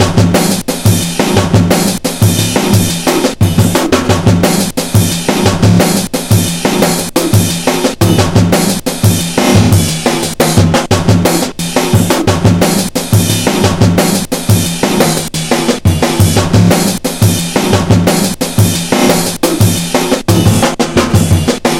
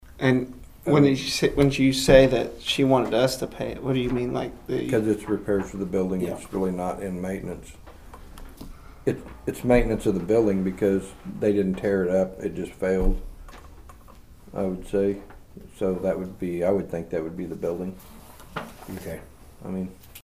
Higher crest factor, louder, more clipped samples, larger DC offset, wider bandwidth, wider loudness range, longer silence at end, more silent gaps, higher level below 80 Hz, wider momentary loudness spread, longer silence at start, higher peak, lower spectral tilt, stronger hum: second, 10 dB vs 22 dB; first, -10 LUFS vs -24 LUFS; first, 0.9% vs under 0.1%; second, under 0.1% vs 0.2%; first, 17.5 kHz vs 15.5 kHz; second, 1 LU vs 10 LU; about the same, 0 s vs 0.05 s; neither; first, -32 dBFS vs -38 dBFS; second, 4 LU vs 16 LU; about the same, 0 s vs 0.1 s; about the same, 0 dBFS vs -2 dBFS; about the same, -5 dB/octave vs -6 dB/octave; neither